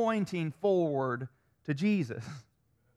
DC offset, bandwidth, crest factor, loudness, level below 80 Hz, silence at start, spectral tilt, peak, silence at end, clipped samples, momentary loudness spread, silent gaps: under 0.1%; 12 kHz; 14 dB; -32 LUFS; -72 dBFS; 0 s; -7.5 dB/octave; -18 dBFS; 0.55 s; under 0.1%; 17 LU; none